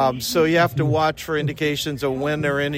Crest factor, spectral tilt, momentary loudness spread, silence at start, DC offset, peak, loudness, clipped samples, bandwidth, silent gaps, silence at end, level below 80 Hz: 16 dB; -5 dB/octave; 6 LU; 0 s; under 0.1%; -6 dBFS; -21 LUFS; under 0.1%; 16.5 kHz; none; 0 s; -50 dBFS